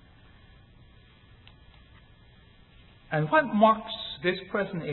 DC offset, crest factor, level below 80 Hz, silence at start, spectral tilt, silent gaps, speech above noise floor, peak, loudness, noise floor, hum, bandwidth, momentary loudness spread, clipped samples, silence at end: under 0.1%; 22 dB; -58 dBFS; 3.1 s; -10 dB/octave; none; 30 dB; -8 dBFS; -26 LUFS; -55 dBFS; none; 4.3 kHz; 10 LU; under 0.1%; 0 s